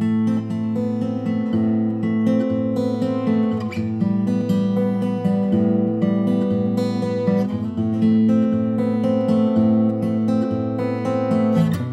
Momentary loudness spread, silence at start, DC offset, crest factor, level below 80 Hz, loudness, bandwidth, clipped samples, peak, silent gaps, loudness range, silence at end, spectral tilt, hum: 5 LU; 0 s; under 0.1%; 12 dB; -64 dBFS; -20 LUFS; 8.6 kHz; under 0.1%; -6 dBFS; none; 2 LU; 0 s; -9 dB/octave; none